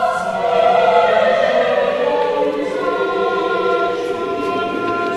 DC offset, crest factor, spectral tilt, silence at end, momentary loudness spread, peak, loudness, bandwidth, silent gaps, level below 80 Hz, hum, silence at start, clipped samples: under 0.1%; 16 dB; -5 dB/octave; 0 s; 7 LU; 0 dBFS; -16 LUFS; 12 kHz; none; -54 dBFS; none; 0 s; under 0.1%